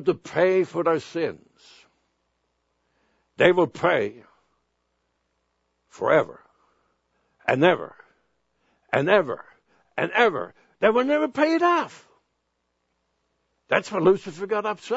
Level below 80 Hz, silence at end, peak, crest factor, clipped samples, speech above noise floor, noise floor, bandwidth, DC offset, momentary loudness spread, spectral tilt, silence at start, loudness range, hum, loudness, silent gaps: -68 dBFS; 0 s; -2 dBFS; 24 dB; under 0.1%; 53 dB; -75 dBFS; 8 kHz; under 0.1%; 12 LU; -6 dB/octave; 0 s; 4 LU; none; -23 LUFS; none